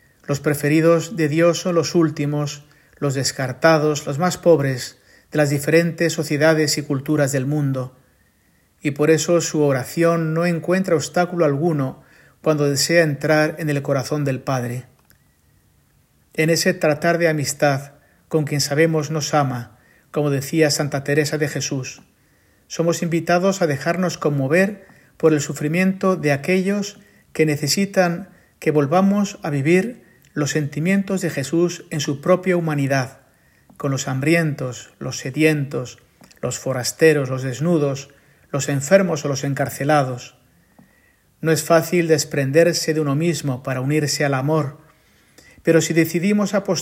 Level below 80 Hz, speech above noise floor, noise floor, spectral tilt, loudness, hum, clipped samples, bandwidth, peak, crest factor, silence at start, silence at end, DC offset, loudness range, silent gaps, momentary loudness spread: -62 dBFS; 41 dB; -59 dBFS; -5 dB/octave; -19 LUFS; none; under 0.1%; 16.5 kHz; 0 dBFS; 18 dB; 0.3 s; 0 s; under 0.1%; 3 LU; none; 10 LU